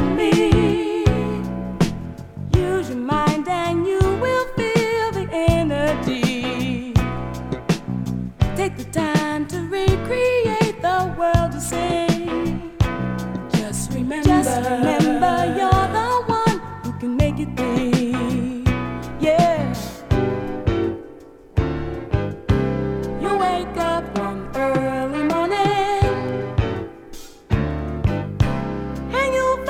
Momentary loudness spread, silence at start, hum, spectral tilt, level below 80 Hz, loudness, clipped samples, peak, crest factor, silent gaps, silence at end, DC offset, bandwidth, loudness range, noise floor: 9 LU; 0 s; none; -6.5 dB/octave; -32 dBFS; -21 LUFS; under 0.1%; -2 dBFS; 18 dB; none; 0 s; under 0.1%; 17 kHz; 4 LU; -42 dBFS